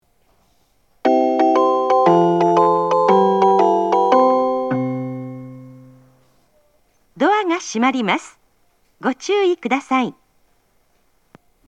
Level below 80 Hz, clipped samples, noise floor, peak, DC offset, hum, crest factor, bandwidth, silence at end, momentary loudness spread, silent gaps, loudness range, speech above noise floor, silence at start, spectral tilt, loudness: -66 dBFS; under 0.1%; -62 dBFS; 0 dBFS; under 0.1%; none; 18 dB; 9.2 kHz; 1.55 s; 11 LU; none; 8 LU; 44 dB; 1.05 s; -5.5 dB/octave; -17 LUFS